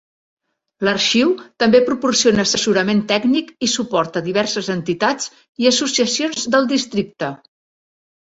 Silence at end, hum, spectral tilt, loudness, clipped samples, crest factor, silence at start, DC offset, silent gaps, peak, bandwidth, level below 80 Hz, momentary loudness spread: 0.9 s; none; -3 dB/octave; -17 LUFS; under 0.1%; 18 dB; 0.8 s; under 0.1%; 5.49-5.53 s; -2 dBFS; 8 kHz; -56 dBFS; 8 LU